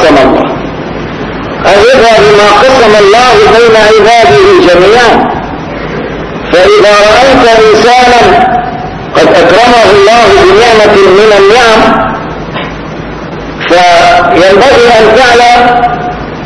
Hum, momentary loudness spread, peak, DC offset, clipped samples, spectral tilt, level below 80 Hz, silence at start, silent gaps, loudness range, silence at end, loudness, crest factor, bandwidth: none; 13 LU; 0 dBFS; 0.6%; 20%; -4 dB/octave; -28 dBFS; 0 s; none; 3 LU; 0 s; -3 LUFS; 4 dB; 11 kHz